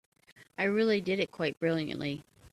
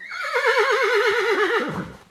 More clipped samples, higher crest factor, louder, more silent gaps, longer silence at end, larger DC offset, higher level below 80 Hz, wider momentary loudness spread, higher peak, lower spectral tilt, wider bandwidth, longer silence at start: neither; about the same, 16 dB vs 16 dB; second, -31 LUFS vs -20 LUFS; neither; about the same, 0.05 s vs 0.15 s; neither; second, -68 dBFS vs -58 dBFS; about the same, 10 LU vs 8 LU; second, -16 dBFS vs -6 dBFS; first, -6.5 dB/octave vs -3.5 dB/octave; about the same, 13 kHz vs 14 kHz; first, 0.4 s vs 0 s